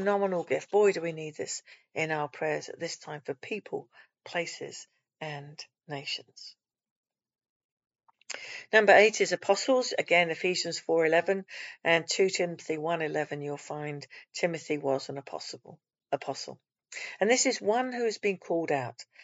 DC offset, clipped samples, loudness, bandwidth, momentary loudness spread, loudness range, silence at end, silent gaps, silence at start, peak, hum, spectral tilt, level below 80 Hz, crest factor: under 0.1%; under 0.1%; -29 LUFS; 8 kHz; 16 LU; 14 LU; 0 s; 6.91-7.03 s, 7.49-7.77 s; 0 s; -8 dBFS; none; -2.5 dB/octave; -90 dBFS; 24 dB